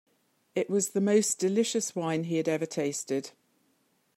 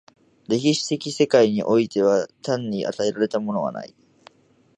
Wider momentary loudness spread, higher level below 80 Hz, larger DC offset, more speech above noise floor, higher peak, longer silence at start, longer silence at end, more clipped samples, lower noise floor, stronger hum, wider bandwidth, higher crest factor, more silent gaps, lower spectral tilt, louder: about the same, 9 LU vs 9 LU; second, -80 dBFS vs -66 dBFS; neither; first, 43 dB vs 34 dB; second, -12 dBFS vs -6 dBFS; about the same, 0.55 s vs 0.5 s; about the same, 0.85 s vs 0.9 s; neither; first, -71 dBFS vs -55 dBFS; neither; first, 16 kHz vs 10 kHz; about the same, 18 dB vs 18 dB; neither; about the same, -4.5 dB/octave vs -5 dB/octave; second, -29 LUFS vs -22 LUFS